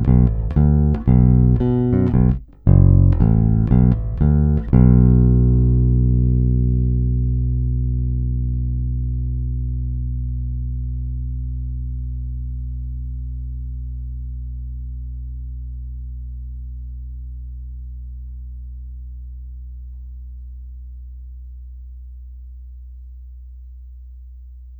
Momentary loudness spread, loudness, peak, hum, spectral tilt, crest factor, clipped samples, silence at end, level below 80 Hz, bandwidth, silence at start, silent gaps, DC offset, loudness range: 24 LU; -18 LUFS; 0 dBFS; none; -13.5 dB/octave; 18 dB; under 0.1%; 0 s; -22 dBFS; 2.3 kHz; 0 s; none; under 0.1%; 22 LU